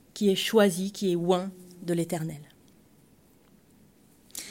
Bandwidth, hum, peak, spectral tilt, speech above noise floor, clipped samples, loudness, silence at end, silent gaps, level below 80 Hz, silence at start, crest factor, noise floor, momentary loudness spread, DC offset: 16.5 kHz; none; -10 dBFS; -5 dB/octave; 34 dB; under 0.1%; -27 LUFS; 0 s; none; -70 dBFS; 0.15 s; 20 dB; -60 dBFS; 17 LU; under 0.1%